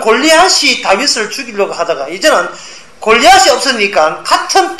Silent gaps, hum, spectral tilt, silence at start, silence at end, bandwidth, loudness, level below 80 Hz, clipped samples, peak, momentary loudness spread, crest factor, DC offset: none; none; -1 dB/octave; 0 s; 0 s; 14.5 kHz; -9 LUFS; -44 dBFS; 0.5%; 0 dBFS; 11 LU; 10 dB; 1%